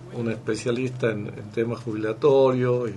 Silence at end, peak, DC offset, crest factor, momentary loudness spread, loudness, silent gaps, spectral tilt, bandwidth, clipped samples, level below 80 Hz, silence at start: 0 s; -8 dBFS; under 0.1%; 14 dB; 11 LU; -24 LUFS; none; -7 dB/octave; 11.5 kHz; under 0.1%; -60 dBFS; 0 s